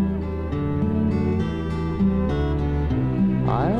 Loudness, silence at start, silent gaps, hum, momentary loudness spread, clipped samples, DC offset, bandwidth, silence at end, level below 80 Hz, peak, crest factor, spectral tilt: -23 LUFS; 0 s; none; none; 5 LU; under 0.1%; under 0.1%; 6.8 kHz; 0 s; -32 dBFS; -8 dBFS; 14 dB; -9.5 dB/octave